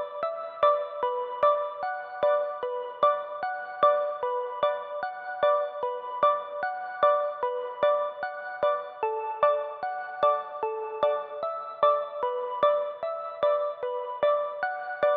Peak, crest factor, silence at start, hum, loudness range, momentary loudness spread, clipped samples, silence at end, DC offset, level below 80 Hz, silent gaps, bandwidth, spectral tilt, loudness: -10 dBFS; 18 dB; 0 s; none; 1 LU; 9 LU; under 0.1%; 0 s; under 0.1%; -74 dBFS; none; 4.7 kHz; -5.5 dB/octave; -28 LUFS